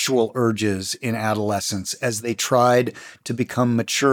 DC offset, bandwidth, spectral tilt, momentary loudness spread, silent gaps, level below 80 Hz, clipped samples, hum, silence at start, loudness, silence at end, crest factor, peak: under 0.1%; 19.5 kHz; -4.5 dB/octave; 8 LU; none; -68 dBFS; under 0.1%; none; 0 s; -21 LUFS; 0 s; 16 dB; -4 dBFS